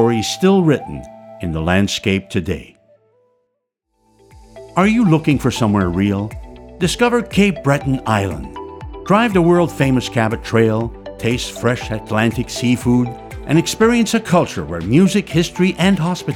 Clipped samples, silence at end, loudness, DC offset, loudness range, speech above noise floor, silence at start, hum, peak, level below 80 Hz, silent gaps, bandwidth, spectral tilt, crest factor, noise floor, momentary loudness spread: under 0.1%; 0 s; -16 LUFS; under 0.1%; 5 LU; 56 dB; 0 s; none; -2 dBFS; -38 dBFS; none; 16.5 kHz; -6 dB/octave; 14 dB; -72 dBFS; 12 LU